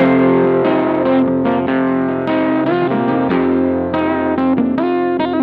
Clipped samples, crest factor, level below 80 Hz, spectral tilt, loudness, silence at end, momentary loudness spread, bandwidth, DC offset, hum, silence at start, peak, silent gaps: under 0.1%; 14 dB; -50 dBFS; -10 dB/octave; -15 LUFS; 0 s; 4 LU; 4.7 kHz; under 0.1%; none; 0 s; 0 dBFS; none